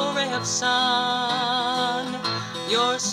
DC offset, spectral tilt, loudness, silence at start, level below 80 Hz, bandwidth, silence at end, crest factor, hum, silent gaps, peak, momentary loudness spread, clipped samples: under 0.1%; -2 dB/octave; -23 LUFS; 0 s; -66 dBFS; 15.5 kHz; 0 s; 16 dB; none; none; -8 dBFS; 6 LU; under 0.1%